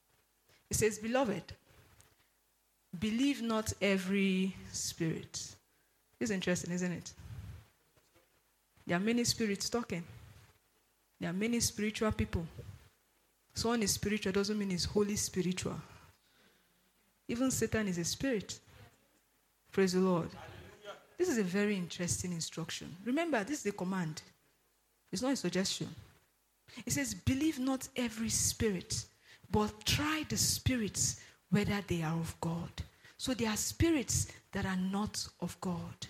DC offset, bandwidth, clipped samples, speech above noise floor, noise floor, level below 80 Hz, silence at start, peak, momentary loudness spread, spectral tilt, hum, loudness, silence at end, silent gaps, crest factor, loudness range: under 0.1%; 16 kHz; under 0.1%; 40 dB; -75 dBFS; -56 dBFS; 0.7 s; -18 dBFS; 15 LU; -4 dB/octave; none; -35 LUFS; 0 s; none; 18 dB; 4 LU